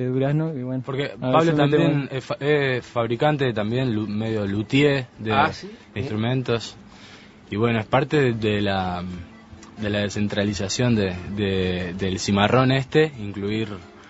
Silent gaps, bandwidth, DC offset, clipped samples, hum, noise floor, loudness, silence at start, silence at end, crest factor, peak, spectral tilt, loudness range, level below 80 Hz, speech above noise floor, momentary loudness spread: none; 8 kHz; under 0.1%; under 0.1%; none; -45 dBFS; -22 LUFS; 0 s; 0 s; 20 dB; -2 dBFS; -6 dB/octave; 3 LU; -50 dBFS; 23 dB; 10 LU